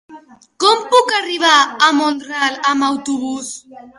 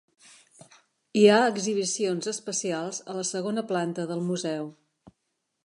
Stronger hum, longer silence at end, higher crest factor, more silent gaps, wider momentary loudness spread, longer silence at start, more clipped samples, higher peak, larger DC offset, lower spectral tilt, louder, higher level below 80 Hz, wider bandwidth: neither; second, 0.1 s vs 0.95 s; second, 16 dB vs 22 dB; neither; about the same, 12 LU vs 13 LU; second, 0.1 s vs 1.15 s; neither; first, 0 dBFS vs -6 dBFS; neither; second, -1 dB/octave vs -4 dB/octave; first, -14 LUFS vs -26 LUFS; first, -66 dBFS vs -78 dBFS; about the same, 11.5 kHz vs 11 kHz